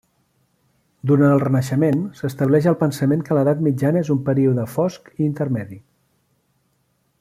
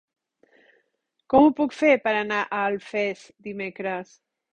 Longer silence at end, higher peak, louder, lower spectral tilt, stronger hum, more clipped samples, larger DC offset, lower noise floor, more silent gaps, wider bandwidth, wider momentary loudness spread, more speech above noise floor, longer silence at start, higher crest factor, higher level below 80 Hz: first, 1.4 s vs 0.55 s; about the same, -4 dBFS vs -4 dBFS; first, -19 LUFS vs -23 LUFS; first, -8.5 dB/octave vs -5.5 dB/octave; neither; neither; neither; second, -66 dBFS vs -74 dBFS; neither; first, 15 kHz vs 9.2 kHz; second, 8 LU vs 15 LU; about the same, 48 dB vs 51 dB; second, 1.05 s vs 1.3 s; second, 16 dB vs 22 dB; about the same, -58 dBFS vs -60 dBFS